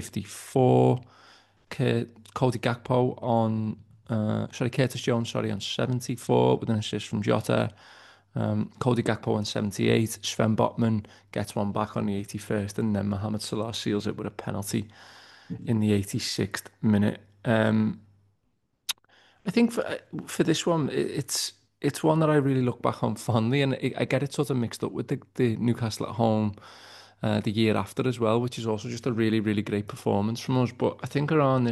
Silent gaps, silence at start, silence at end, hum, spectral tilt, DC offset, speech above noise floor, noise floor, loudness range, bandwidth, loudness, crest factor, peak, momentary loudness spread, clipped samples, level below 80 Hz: none; 0 s; 0 s; none; -6 dB/octave; under 0.1%; 48 dB; -74 dBFS; 4 LU; 12.5 kHz; -27 LUFS; 20 dB; -8 dBFS; 10 LU; under 0.1%; -64 dBFS